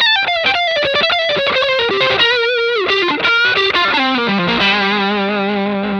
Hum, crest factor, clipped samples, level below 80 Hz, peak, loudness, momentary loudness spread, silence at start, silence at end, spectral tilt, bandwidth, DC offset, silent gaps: none; 12 dB; under 0.1%; -48 dBFS; -2 dBFS; -13 LUFS; 4 LU; 0 s; 0 s; -4.5 dB/octave; 9 kHz; under 0.1%; none